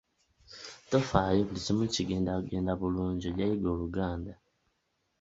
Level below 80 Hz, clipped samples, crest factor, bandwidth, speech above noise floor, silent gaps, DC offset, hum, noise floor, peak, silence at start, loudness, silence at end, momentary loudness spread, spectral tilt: -48 dBFS; under 0.1%; 22 dB; 8 kHz; 48 dB; none; under 0.1%; none; -78 dBFS; -10 dBFS; 0.5 s; -31 LUFS; 0.9 s; 18 LU; -6 dB/octave